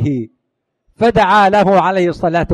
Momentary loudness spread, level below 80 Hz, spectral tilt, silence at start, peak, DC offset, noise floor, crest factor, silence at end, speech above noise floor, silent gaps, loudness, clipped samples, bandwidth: 11 LU; -40 dBFS; -7 dB/octave; 0 s; 0 dBFS; under 0.1%; -72 dBFS; 14 dB; 0 s; 60 dB; none; -12 LUFS; under 0.1%; 12 kHz